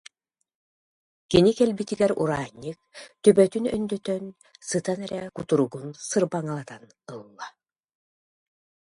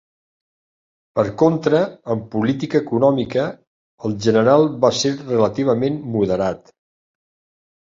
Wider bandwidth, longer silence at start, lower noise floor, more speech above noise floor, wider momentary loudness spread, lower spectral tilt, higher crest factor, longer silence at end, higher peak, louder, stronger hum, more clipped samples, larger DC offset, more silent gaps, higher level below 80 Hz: first, 11.5 kHz vs 7.6 kHz; first, 1.3 s vs 1.15 s; second, -71 dBFS vs under -90 dBFS; second, 47 dB vs over 72 dB; first, 22 LU vs 10 LU; about the same, -5.5 dB/octave vs -6 dB/octave; about the same, 22 dB vs 18 dB; about the same, 1.35 s vs 1.35 s; about the same, -4 dBFS vs -2 dBFS; second, -24 LUFS vs -19 LUFS; neither; neither; neither; second, none vs 3.67-3.98 s; about the same, -58 dBFS vs -54 dBFS